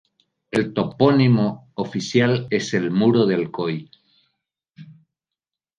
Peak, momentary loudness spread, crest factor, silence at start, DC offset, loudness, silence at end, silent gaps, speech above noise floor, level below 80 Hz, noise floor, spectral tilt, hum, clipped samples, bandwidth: -2 dBFS; 10 LU; 20 dB; 0.55 s; under 0.1%; -20 LUFS; 0.85 s; none; 68 dB; -60 dBFS; -87 dBFS; -6.5 dB/octave; none; under 0.1%; 9.8 kHz